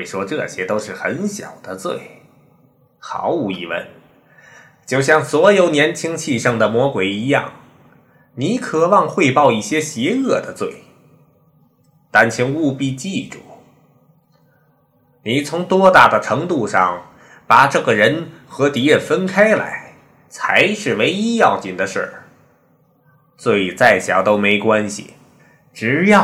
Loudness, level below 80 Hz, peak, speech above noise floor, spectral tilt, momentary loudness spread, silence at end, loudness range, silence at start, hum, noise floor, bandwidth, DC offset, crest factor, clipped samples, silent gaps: -16 LUFS; -58 dBFS; 0 dBFS; 41 dB; -4.5 dB/octave; 14 LU; 0 s; 10 LU; 0 s; none; -57 dBFS; 16 kHz; under 0.1%; 18 dB; 0.1%; none